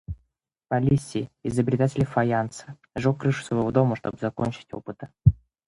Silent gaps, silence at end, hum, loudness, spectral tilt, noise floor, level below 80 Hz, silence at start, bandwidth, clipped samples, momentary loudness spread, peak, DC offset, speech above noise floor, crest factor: none; 0.35 s; none; -25 LUFS; -7.5 dB/octave; -73 dBFS; -42 dBFS; 0.1 s; 11.5 kHz; under 0.1%; 15 LU; -4 dBFS; under 0.1%; 48 dB; 22 dB